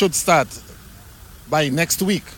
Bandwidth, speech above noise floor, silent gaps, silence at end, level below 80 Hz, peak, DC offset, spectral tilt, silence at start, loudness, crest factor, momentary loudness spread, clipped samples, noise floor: 18 kHz; 23 dB; none; 0 s; -46 dBFS; -2 dBFS; under 0.1%; -3.5 dB/octave; 0 s; -19 LUFS; 18 dB; 10 LU; under 0.1%; -42 dBFS